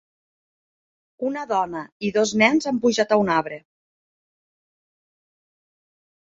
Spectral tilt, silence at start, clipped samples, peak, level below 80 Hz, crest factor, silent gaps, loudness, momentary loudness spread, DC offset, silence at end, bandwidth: -4.5 dB/octave; 1.2 s; under 0.1%; -2 dBFS; -64 dBFS; 22 dB; 1.92-2.00 s; -21 LUFS; 12 LU; under 0.1%; 2.75 s; 7.8 kHz